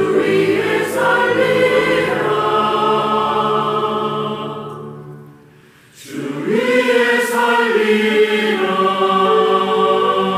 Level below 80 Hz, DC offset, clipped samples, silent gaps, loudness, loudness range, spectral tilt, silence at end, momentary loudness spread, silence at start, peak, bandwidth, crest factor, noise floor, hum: -56 dBFS; under 0.1%; under 0.1%; none; -15 LUFS; 7 LU; -5 dB/octave; 0 s; 11 LU; 0 s; -4 dBFS; 16 kHz; 12 dB; -46 dBFS; none